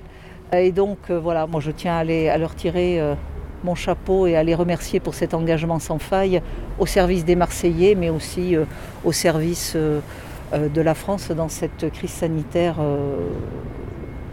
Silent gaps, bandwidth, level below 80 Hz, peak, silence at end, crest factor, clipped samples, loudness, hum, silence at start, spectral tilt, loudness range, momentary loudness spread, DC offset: none; 16.5 kHz; -36 dBFS; -4 dBFS; 0 s; 16 dB; under 0.1%; -21 LUFS; none; 0 s; -6 dB/octave; 3 LU; 11 LU; under 0.1%